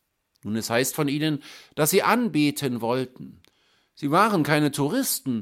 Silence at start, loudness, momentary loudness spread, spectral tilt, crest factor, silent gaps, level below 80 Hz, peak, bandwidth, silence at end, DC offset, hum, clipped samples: 0.45 s; -23 LUFS; 12 LU; -4.5 dB/octave; 20 dB; none; -68 dBFS; -4 dBFS; 16.5 kHz; 0 s; under 0.1%; none; under 0.1%